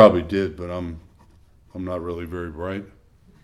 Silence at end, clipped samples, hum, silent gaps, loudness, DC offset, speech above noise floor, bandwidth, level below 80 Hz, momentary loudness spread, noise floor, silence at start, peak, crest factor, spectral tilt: 0.55 s; under 0.1%; none; none; -26 LUFS; under 0.1%; 30 dB; 12 kHz; -46 dBFS; 15 LU; -53 dBFS; 0 s; 0 dBFS; 22 dB; -8 dB/octave